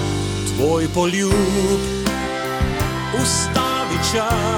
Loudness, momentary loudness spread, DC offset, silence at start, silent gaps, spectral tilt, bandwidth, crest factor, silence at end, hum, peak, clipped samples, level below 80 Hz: -19 LUFS; 5 LU; under 0.1%; 0 s; none; -4.5 dB/octave; 19.5 kHz; 16 dB; 0 s; none; -4 dBFS; under 0.1%; -32 dBFS